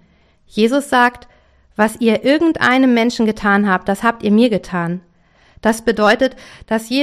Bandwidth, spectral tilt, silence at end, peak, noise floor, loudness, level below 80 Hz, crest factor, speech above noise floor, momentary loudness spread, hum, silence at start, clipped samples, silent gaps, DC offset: 14.5 kHz; -5 dB/octave; 0 s; 0 dBFS; -53 dBFS; -15 LUFS; -48 dBFS; 16 dB; 38 dB; 9 LU; none; 0.55 s; under 0.1%; none; under 0.1%